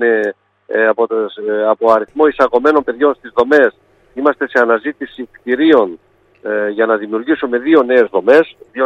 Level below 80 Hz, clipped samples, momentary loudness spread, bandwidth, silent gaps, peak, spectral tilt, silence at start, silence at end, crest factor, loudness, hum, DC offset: -56 dBFS; under 0.1%; 11 LU; 6.8 kHz; none; 0 dBFS; -6 dB/octave; 0 s; 0 s; 14 dB; -14 LUFS; none; under 0.1%